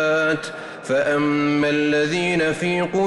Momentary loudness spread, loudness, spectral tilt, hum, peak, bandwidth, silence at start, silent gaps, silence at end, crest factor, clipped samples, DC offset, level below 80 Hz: 6 LU; -20 LUFS; -5.5 dB/octave; none; -10 dBFS; 11.5 kHz; 0 s; none; 0 s; 10 dB; under 0.1%; under 0.1%; -56 dBFS